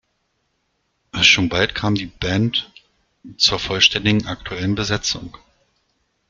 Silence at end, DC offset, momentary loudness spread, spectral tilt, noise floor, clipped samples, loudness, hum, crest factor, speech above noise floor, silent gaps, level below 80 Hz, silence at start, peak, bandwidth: 1 s; under 0.1%; 12 LU; -3.5 dB/octave; -70 dBFS; under 0.1%; -18 LUFS; none; 22 dB; 50 dB; none; -44 dBFS; 1.15 s; 0 dBFS; 7.6 kHz